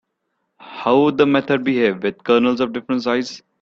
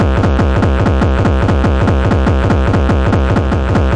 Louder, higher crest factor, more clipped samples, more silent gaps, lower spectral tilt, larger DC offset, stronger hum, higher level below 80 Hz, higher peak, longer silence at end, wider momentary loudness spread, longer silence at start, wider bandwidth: second, -18 LUFS vs -13 LUFS; first, 18 dB vs 10 dB; neither; neither; second, -6 dB/octave vs -8 dB/octave; neither; neither; second, -60 dBFS vs -16 dBFS; about the same, -2 dBFS vs 0 dBFS; first, 0.25 s vs 0 s; first, 9 LU vs 1 LU; first, 0.65 s vs 0 s; second, 7.4 kHz vs 9 kHz